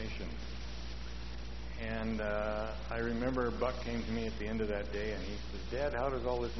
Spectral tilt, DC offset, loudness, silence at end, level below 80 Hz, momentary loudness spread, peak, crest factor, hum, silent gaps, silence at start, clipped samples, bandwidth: -5 dB/octave; 0.6%; -38 LUFS; 0 s; -44 dBFS; 10 LU; -20 dBFS; 18 dB; none; none; 0 s; under 0.1%; 6.2 kHz